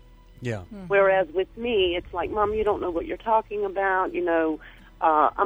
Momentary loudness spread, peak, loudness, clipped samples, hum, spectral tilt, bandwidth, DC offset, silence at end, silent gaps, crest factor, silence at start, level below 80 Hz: 12 LU; -6 dBFS; -24 LUFS; under 0.1%; none; -6.5 dB/octave; over 20 kHz; under 0.1%; 0 s; none; 18 dB; 0.4 s; -48 dBFS